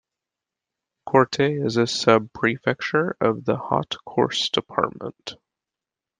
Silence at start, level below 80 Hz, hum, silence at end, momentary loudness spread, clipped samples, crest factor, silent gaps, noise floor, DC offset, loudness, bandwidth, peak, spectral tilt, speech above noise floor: 1.05 s; -62 dBFS; none; 0.85 s; 12 LU; under 0.1%; 22 dB; none; -88 dBFS; under 0.1%; -22 LUFS; 9.8 kHz; -2 dBFS; -5 dB/octave; 66 dB